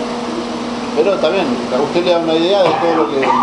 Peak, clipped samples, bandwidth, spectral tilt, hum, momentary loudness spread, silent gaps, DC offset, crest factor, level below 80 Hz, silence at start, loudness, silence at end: 0 dBFS; under 0.1%; 11 kHz; -5 dB/octave; none; 9 LU; none; under 0.1%; 14 dB; -50 dBFS; 0 s; -15 LUFS; 0 s